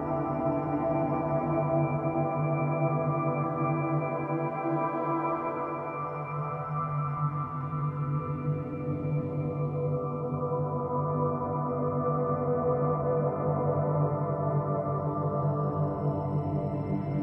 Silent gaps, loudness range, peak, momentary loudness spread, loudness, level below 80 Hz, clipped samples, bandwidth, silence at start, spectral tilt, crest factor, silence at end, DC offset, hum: none; 3 LU; -16 dBFS; 5 LU; -30 LUFS; -58 dBFS; under 0.1%; 3 kHz; 0 s; -12 dB/octave; 14 dB; 0 s; under 0.1%; none